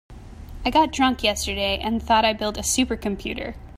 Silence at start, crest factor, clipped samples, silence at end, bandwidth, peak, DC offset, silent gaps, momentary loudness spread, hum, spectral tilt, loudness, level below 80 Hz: 0.1 s; 16 dB; under 0.1%; 0.05 s; 16 kHz; -6 dBFS; under 0.1%; none; 11 LU; none; -3 dB/octave; -22 LUFS; -38 dBFS